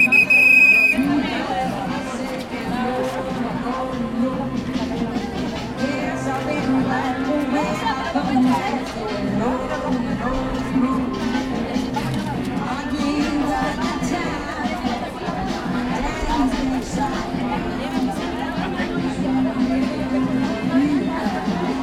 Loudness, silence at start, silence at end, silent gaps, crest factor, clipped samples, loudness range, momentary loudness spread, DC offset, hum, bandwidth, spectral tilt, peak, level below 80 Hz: -20 LUFS; 0 s; 0 s; none; 16 dB; under 0.1%; 3 LU; 6 LU; under 0.1%; none; 16 kHz; -5.5 dB/octave; -4 dBFS; -38 dBFS